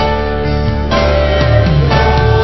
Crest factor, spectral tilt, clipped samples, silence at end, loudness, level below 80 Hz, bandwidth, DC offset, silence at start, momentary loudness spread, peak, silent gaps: 12 dB; -7.5 dB/octave; 0.1%; 0 s; -12 LUFS; -16 dBFS; 6 kHz; 4%; 0 s; 5 LU; 0 dBFS; none